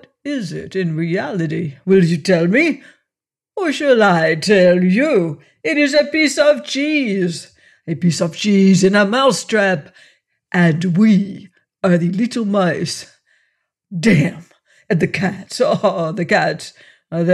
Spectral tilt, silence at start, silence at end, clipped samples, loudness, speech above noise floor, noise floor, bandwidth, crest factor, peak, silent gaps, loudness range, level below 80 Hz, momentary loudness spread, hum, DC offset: -5.5 dB/octave; 0.25 s; 0 s; under 0.1%; -16 LUFS; 72 dB; -87 dBFS; 12.5 kHz; 14 dB; -2 dBFS; none; 4 LU; -58 dBFS; 12 LU; none; under 0.1%